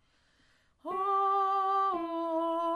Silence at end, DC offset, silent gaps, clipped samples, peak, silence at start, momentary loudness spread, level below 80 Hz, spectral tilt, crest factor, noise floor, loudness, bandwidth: 0 s; under 0.1%; none; under 0.1%; -20 dBFS; 0.85 s; 7 LU; -74 dBFS; -5 dB/octave; 10 dB; -68 dBFS; -30 LUFS; 10 kHz